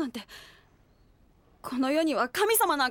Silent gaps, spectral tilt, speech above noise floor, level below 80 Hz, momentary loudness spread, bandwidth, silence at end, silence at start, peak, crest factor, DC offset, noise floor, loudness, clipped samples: none; -2 dB/octave; 34 dB; -64 dBFS; 22 LU; 17.5 kHz; 0 s; 0 s; -12 dBFS; 18 dB; under 0.1%; -61 dBFS; -26 LUFS; under 0.1%